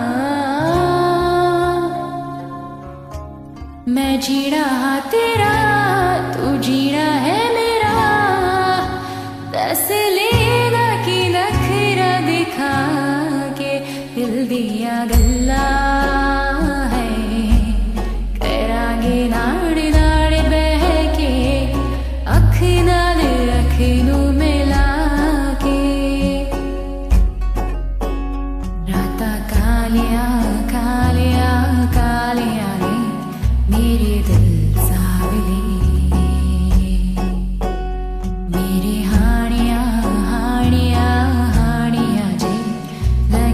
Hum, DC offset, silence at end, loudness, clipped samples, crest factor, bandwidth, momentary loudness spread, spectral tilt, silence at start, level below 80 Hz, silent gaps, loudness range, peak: none; under 0.1%; 0 s; -17 LUFS; under 0.1%; 14 dB; 14.5 kHz; 9 LU; -6 dB/octave; 0 s; -20 dBFS; none; 4 LU; 0 dBFS